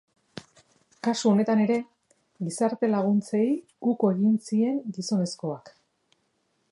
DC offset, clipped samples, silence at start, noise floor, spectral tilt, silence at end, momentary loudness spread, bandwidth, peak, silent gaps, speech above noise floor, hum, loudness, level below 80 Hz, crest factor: under 0.1%; under 0.1%; 0.35 s; -72 dBFS; -6.5 dB/octave; 1.05 s; 17 LU; 11.5 kHz; -10 dBFS; none; 48 dB; none; -26 LUFS; -76 dBFS; 16 dB